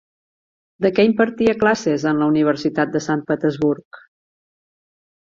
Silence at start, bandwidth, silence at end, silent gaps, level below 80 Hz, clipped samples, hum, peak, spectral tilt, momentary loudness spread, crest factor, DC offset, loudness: 0.8 s; 7.6 kHz; 1.25 s; 3.85-3.91 s; -56 dBFS; under 0.1%; none; -2 dBFS; -6 dB/octave; 6 LU; 18 dB; under 0.1%; -18 LUFS